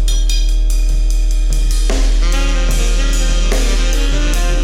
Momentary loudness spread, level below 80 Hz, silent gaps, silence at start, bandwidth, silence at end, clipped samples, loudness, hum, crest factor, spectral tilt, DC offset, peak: 1 LU; -12 dBFS; none; 0 s; 13.5 kHz; 0 s; under 0.1%; -17 LUFS; none; 10 dB; -4 dB/octave; under 0.1%; -2 dBFS